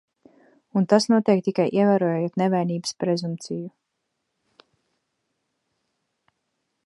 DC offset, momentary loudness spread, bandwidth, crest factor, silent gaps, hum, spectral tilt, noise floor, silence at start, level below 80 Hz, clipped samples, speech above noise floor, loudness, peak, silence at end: under 0.1%; 12 LU; 11.5 kHz; 22 dB; none; none; -6 dB/octave; -78 dBFS; 0.75 s; -74 dBFS; under 0.1%; 57 dB; -22 LUFS; -4 dBFS; 3.15 s